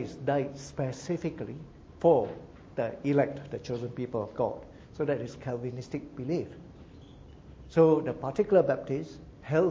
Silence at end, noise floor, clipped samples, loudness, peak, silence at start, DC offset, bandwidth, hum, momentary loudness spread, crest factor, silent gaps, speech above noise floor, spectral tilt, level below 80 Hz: 0 s; -50 dBFS; under 0.1%; -30 LUFS; -10 dBFS; 0 s; under 0.1%; 7.8 kHz; none; 20 LU; 20 dB; none; 21 dB; -7.5 dB/octave; -56 dBFS